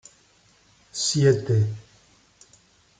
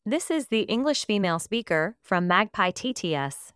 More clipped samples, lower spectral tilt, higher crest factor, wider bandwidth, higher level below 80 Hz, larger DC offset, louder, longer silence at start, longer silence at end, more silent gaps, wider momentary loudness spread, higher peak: neither; about the same, -5 dB/octave vs -4 dB/octave; about the same, 20 dB vs 20 dB; second, 9.4 kHz vs 11 kHz; about the same, -64 dBFS vs -64 dBFS; neither; first, -22 LUFS vs -25 LUFS; first, 0.95 s vs 0.05 s; first, 1.2 s vs 0.05 s; neither; first, 16 LU vs 6 LU; about the same, -8 dBFS vs -6 dBFS